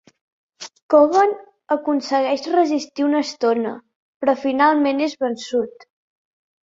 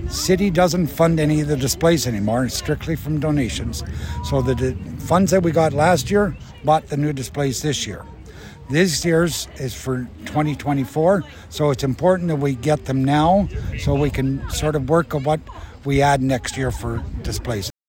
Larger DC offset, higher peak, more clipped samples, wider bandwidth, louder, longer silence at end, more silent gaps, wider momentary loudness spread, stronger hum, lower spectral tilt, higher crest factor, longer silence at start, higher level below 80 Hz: neither; about the same, -2 dBFS vs -4 dBFS; neither; second, 7.8 kHz vs 16.5 kHz; about the same, -19 LUFS vs -20 LUFS; first, 0.95 s vs 0.2 s; first, 0.82-0.89 s, 3.95-4.20 s vs none; first, 15 LU vs 11 LU; neither; second, -4 dB/octave vs -5.5 dB/octave; about the same, 18 dB vs 16 dB; first, 0.6 s vs 0 s; second, -68 dBFS vs -34 dBFS